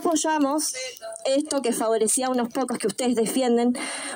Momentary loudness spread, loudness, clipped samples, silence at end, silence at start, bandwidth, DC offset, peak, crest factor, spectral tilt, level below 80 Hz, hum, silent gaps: 6 LU; -24 LUFS; under 0.1%; 0 s; 0 s; 17 kHz; under 0.1%; -12 dBFS; 12 dB; -2.5 dB/octave; -72 dBFS; none; none